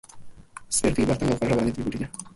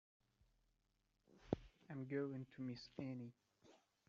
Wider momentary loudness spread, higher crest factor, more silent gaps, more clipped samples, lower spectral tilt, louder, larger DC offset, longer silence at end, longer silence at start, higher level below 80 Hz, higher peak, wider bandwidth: about the same, 8 LU vs 8 LU; second, 18 dB vs 30 dB; neither; neither; second, -5 dB/octave vs -7 dB/octave; first, -25 LUFS vs -50 LUFS; neither; second, 0.05 s vs 0.35 s; second, 0.15 s vs 1.3 s; first, -44 dBFS vs -72 dBFS; first, -8 dBFS vs -22 dBFS; first, 11.5 kHz vs 7.4 kHz